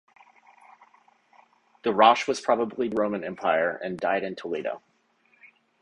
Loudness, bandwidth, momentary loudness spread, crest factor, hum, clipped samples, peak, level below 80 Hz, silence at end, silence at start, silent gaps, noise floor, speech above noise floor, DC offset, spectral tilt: -25 LUFS; 11 kHz; 13 LU; 24 dB; none; under 0.1%; -4 dBFS; -70 dBFS; 0.35 s; 1.85 s; none; -66 dBFS; 41 dB; under 0.1%; -4.5 dB/octave